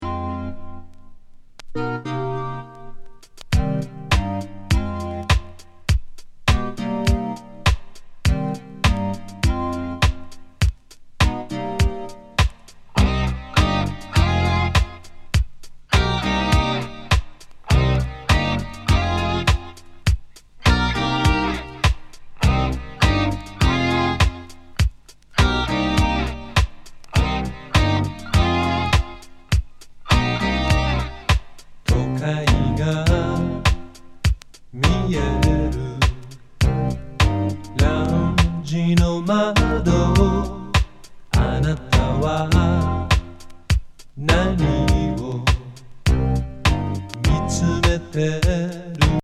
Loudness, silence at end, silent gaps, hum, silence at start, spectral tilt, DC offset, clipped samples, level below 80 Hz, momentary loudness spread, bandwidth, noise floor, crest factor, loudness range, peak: -21 LUFS; 0.05 s; none; none; 0 s; -5.5 dB/octave; under 0.1%; under 0.1%; -26 dBFS; 9 LU; 14 kHz; -41 dBFS; 20 dB; 4 LU; -2 dBFS